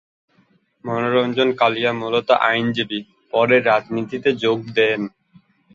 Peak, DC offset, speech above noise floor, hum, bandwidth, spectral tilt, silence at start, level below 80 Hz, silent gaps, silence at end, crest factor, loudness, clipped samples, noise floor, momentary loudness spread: -2 dBFS; under 0.1%; 41 dB; none; 7.4 kHz; -6 dB/octave; 0.85 s; -64 dBFS; none; 0.65 s; 18 dB; -19 LUFS; under 0.1%; -60 dBFS; 10 LU